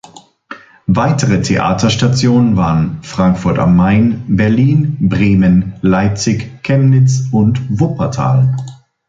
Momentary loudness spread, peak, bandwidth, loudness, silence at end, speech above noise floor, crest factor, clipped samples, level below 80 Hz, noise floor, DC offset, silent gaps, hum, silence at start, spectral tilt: 6 LU; 0 dBFS; 7.8 kHz; -12 LUFS; 0.35 s; 24 dB; 12 dB; under 0.1%; -34 dBFS; -35 dBFS; under 0.1%; none; none; 0.5 s; -6.5 dB/octave